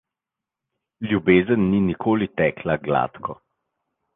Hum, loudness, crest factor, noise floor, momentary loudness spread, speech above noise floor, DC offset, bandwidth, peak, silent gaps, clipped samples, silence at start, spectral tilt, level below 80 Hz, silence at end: none; -21 LUFS; 20 dB; -87 dBFS; 13 LU; 67 dB; under 0.1%; 3.9 kHz; -2 dBFS; none; under 0.1%; 1 s; -10.5 dB/octave; -50 dBFS; 0.8 s